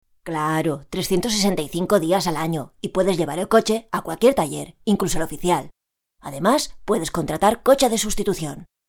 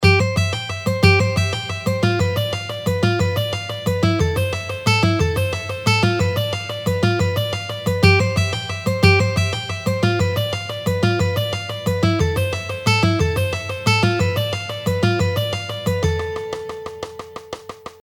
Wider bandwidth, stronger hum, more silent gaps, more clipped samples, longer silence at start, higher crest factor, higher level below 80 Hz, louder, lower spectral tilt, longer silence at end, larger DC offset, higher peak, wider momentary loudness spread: first, 19.5 kHz vs 17.5 kHz; neither; neither; neither; first, 0.25 s vs 0 s; about the same, 18 dB vs 20 dB; about the same, -42 dBFS vs -38 dBFS; about the same, -21 LUFS vs -19 LUFS; about the same, -4.5 dB/octave vs -5.5 dB/octave; first, 0.25 s vs 0.1 s; neither; about the same, -2 dBFS vs 0 dBFS; about the same, 9 LU vs 9 LU